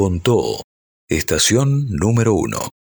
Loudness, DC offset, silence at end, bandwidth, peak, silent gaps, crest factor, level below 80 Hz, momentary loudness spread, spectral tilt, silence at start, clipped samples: -17 LUFS; under 0.1%; 0.15 s; over 20 kHz; -4 dBFS; 0.64-1.08 s; 14 dB; -38 dBFS; 9 LU; -4.5 dB/octave; 0 s; under 0.1%